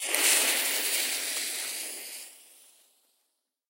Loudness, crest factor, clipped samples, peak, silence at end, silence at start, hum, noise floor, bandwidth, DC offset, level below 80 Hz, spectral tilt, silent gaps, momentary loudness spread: -26 LUFS; 24 dB; under 0.1%; -6 dBFS; 1.3 s; 0 s; none; -79 dBFS; 16 kHz; under 0.1%; under -90 dBFS; 4 dB/octave; none; 18 LU